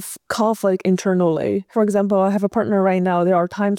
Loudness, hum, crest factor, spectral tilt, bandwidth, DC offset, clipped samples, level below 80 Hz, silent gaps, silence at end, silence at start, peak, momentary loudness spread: -18 LUFS; none; 12 dB; -6.5 dB/octave; 16.5 kHz; under 0.1%; under 0.1%; -60 dBFS; none; 0 s; 0 s; -6 dBFS; 4 LU